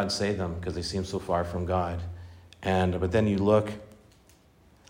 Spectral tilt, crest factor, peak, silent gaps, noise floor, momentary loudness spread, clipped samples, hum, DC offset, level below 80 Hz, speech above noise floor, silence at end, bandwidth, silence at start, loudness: -6 dB/octave; 18 dB; -10 dBFS; none; -59 dBFS; 14 LU; under 0.1%; none; under 0.1%; -52 dBFS; 32 dB; 0.95 s; 16 kHz; 0 s; -28 LUFS